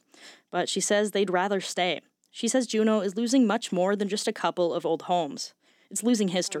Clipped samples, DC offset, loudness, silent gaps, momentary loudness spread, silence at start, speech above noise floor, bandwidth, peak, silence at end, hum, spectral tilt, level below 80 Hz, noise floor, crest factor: under 0.1%; under 0.1%; -26 LUFS; none; 9 LU; 0.2 s; 27 dB; 15.5 kHz; -12 dBFS; 0 s; none; -4 dB/octave; under -90 dBFS; -52 dBFS; 16 dB